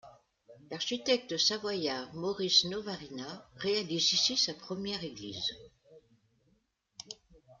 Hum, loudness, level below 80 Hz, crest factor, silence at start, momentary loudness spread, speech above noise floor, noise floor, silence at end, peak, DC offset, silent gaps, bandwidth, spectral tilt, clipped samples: none; -31 LUFS; -70 dBFS; 22 dB; 0.05 s; 20 LU; 41 dB; -74 dBFS; 0.05 s; -12 dBFS; under 0.1%; none; 12 kHz; -2.5 dB/octave; under 0.1%